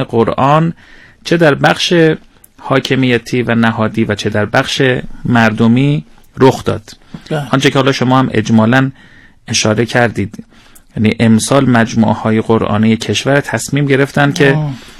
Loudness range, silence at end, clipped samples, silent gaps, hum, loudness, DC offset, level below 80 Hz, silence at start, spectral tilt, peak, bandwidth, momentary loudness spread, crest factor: 2 LU; 0.1 s; 0.7%; none; none; -12 LUFS; under 0.1%; -40 dBFS; 0 s; -5.5 dB/octave; 0 dBFS; 13.5 kHz; 9 LU; 12 dB